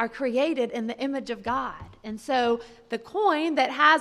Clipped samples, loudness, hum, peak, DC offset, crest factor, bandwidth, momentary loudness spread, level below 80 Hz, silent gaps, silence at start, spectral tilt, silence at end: under 0.1%; -26 LUFS; none; -4 dBFS; under 0.1%; 20 dB; 13 kHz; 13 LU; -58 dBFS; none; 0 s; -4 dB/octave; 0 s